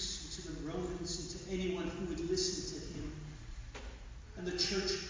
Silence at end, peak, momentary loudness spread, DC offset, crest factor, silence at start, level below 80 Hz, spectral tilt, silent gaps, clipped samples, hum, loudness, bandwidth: 0 s; -20 dBFS; 15 LU; under 0.1%; 18 dB; 0 s; -50 dBFS; -3.5 dB/octave; none; under 0.1%; none; -39 LUFS; 7.6 kHz